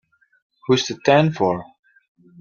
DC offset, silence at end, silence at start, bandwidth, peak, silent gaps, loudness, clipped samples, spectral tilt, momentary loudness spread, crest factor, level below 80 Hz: under 0.1%; 0.75 s; 0.7 s; 7.2 kHz; 0 dBFS; none; -19 LUFS; under 0.1%; -5.5 dB/octave; 11 LU; 20 dB; -60 dBFS